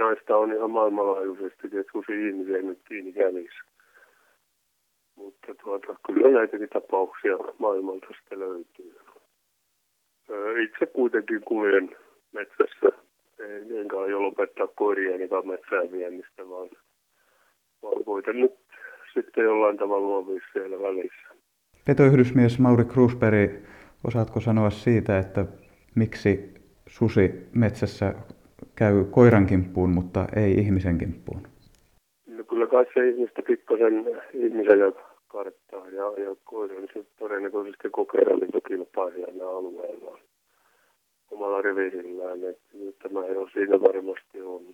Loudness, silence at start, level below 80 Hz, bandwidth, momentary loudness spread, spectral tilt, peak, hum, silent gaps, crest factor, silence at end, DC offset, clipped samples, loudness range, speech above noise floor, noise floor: -24 LUFS; 0 s; -54 dBFS; 9.6 kHz; 19 LU; -9 dB/octave; -4 dBFS; none; none; 22 dB; 0.1 s; under 0.1%; under 0.1%; 10 LU; 49 dB; -73 dBFS